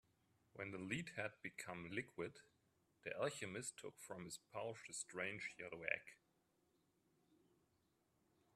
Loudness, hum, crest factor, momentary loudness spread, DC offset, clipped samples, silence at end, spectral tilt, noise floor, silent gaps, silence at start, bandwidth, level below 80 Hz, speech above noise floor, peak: -49 LUFS; none; 28 dB; 9 LU; under 0.1%; under 0.1%; 2.4 s; -3.5 dB/octave; -83 dBFS; none; 0.55 s; 13 kHz; -84 dBFS; 33 dB; -22 dBFS